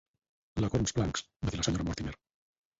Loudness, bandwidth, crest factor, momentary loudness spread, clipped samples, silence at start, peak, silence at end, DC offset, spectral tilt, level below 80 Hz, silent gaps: -33 LUFS; 8 kHz; 18 dB; 11 LU; under 0.1%; 0.55 s; -16 dBFS; 0.65 s; under 0.1%; -5 dB/octave; -46 dBFS; 1.36-1.40 s